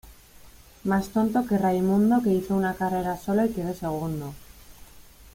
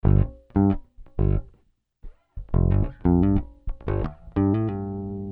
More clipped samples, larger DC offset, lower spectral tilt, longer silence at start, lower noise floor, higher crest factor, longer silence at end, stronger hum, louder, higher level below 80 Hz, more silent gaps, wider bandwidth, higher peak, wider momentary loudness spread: neither; neither; second, -7.5 dB/octave vs -13 dB/octave; about the same, 0.05 s vs 0.05 s; second, -50 dBFS vs -64 dBFS; about the same, 14 dB vs 16 dB; about the same, 0.1 s vs 0 s; neither; about the same, -25 LUFS vs -25 LUFS; second, -50 dBFS vs -30 dBFS; neither; first, 16.5 kHz vs 3.8 kHz; second, -12 dBFS vs -8 dBFS; second, 10 LU vs 13 LU